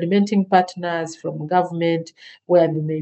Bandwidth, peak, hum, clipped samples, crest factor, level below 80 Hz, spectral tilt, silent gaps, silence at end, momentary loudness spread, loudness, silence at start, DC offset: 8.4 kHz; 0 dBFS; none; under 0.1%; 20 dB; -74 dBFS; -7 dB/octave; none; 0 s; 10 LU; -20 LUFS; 0 s; under 0.1%